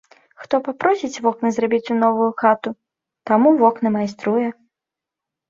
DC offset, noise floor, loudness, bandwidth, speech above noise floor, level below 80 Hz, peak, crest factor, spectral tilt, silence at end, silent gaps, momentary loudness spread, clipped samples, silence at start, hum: under 0.1%; -86 dBFS; -19 LUFS; 7.6 kHz; 68 dB; -66 dBFS; -2 dBFS; 18 dB; -6 dB/octave; 0.95 s; none; 8 LU; under 0.1%; 0.4 s; none